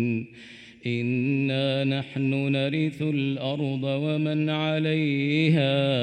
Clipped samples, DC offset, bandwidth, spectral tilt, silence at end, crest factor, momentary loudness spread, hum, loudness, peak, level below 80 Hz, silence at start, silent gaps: under 0.1%; under 0.1%; 9.2 kHz; -8 dB/octave; 0 s; 14 dB; 8 LU; none; -25 LUFS; -10 dBFS; -70 dBFS; 0 s; none